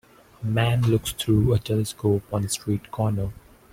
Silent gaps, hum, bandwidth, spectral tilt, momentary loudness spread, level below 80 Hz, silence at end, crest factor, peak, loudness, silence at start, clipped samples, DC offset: none; none; 16.5 kHz; -6 dB/octave; 8 LU; -44 dBFS; 0.4 s; 16 dB; -8 dBFS; -24 LUFS; 0.4 s; under 0.1%; under 0.1%